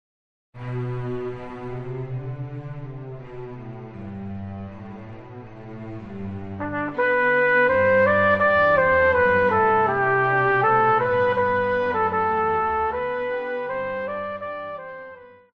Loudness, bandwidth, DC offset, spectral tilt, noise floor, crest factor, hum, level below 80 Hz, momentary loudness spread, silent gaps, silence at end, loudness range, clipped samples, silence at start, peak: -21 LUFS; 5.8 kHz; under 0.1%; -8 dB/octave; -43 dBFS; 16 dB; none; -52 dBFS; 20 LU; none; 0.25 s; 18 LU; under 0.1%; 0.55 s; -6 dBFS